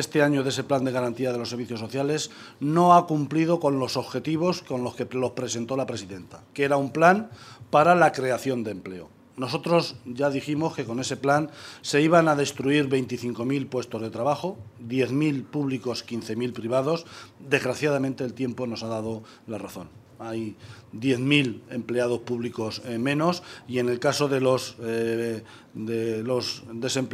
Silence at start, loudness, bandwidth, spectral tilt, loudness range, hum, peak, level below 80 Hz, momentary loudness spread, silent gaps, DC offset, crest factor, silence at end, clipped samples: 0 s; -25 LUFS; 15 kHz; -5.5 dB/octave; 5 LU; none; -4 dBFS; -68 dBFS; 16 LU; none; under 0.1%; 22 dB; 0 s; under 0.1%